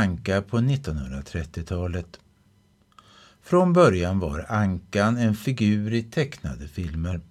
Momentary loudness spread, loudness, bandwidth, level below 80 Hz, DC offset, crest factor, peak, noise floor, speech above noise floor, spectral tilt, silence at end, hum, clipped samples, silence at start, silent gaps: 14 LU; -24 LUFS; 14 kHz; -42 dBFS; under 0.1%; 20 dB; -6 dBFS; -61 dBFS; 37 dB; -7 dB/octave; 0.1 s; none; under 0.1%; 0 s; none